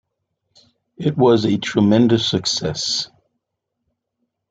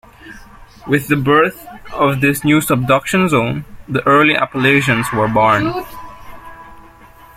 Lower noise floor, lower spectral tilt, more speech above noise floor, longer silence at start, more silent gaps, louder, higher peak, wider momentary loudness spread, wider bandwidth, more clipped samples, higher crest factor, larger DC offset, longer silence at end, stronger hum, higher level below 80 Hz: first, -78 dBFS vs -41 dBFS; about the same, -5 dB/octave vs -5.5 dB/octave; first, 61 dB vs 27 dB; first, 1 s vs 0.25 s; neither; second, -17 LUFS vs -14 LUFS; about the same, -2 dBFS vs 0 dBFS; second, 9 LU vs 15 LU; second, 9.2 kHz vs 16.5 kHz; neither; about the same, 18 dB vs 14 dB; neither; first, 1.45 s vs 0.55 s; neither; second, -56 dBFS vs -44 dBFS